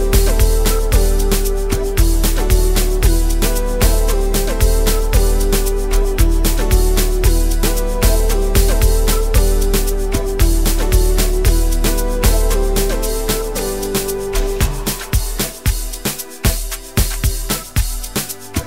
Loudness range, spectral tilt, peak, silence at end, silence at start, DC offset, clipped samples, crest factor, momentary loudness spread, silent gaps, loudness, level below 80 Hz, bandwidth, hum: 4 LU; -4.5 dB/octave; 0 dBFS; 0 s; 0 s; 1%; under 0.1%; 14 dB; 5 LU; none; -17 LUFS; -14 dBFS; 16.5 kHz; none